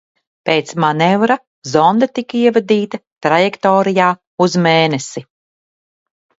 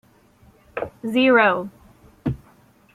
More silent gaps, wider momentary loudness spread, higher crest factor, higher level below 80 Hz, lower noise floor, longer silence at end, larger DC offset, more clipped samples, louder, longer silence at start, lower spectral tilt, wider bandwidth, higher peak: first, 1.47-1.62 s, 3.07-3.16 s, 4.27-4.38 s vs none; second, 9 LU vs 20 LU; about the same, 16 dB vs 20 dB; second, -60 dBFS vs -50 dBFS; first, under -90 dBFS vs -54 dBFS; first, 1.15 s vs 0.6 s; neither; neither; first, -14 LUFS vs -20 LUFS; second, 0.45 s vs 0.75 s; second, -5.5 dB/octave vs -7 dB/octave; second, 8 kHz vs 13.5 kHz; first, 0 dBFS vs -4 dBFS